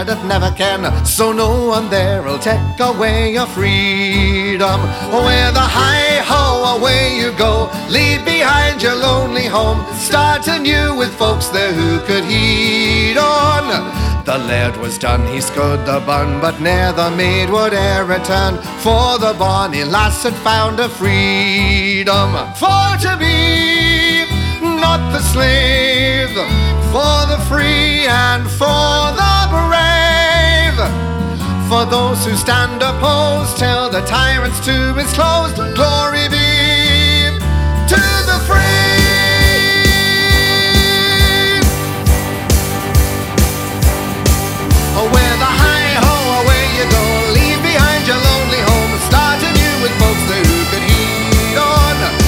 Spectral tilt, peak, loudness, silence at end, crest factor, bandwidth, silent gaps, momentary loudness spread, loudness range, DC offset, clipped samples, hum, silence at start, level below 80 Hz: -4 dB/octave; 0 dBFS; -12 LUFS; 0 s; 12 dB; 17.5 kHz; none; 6 LU; 4 LU; under 0.1%; under 0.1%; none; 0 s; -20 dBFS